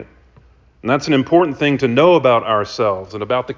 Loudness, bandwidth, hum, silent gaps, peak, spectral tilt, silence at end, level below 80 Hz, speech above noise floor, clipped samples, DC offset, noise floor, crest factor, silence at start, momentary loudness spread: -15 LUFS; 7.6 kHz; none; none; -2 dBFS; -6 dB/octave; 0.05 s; -50 dBFS; 34 dB; under 0.1%; under 0.1%; -49 dBFS; 16 dB; 0 s; 9 LU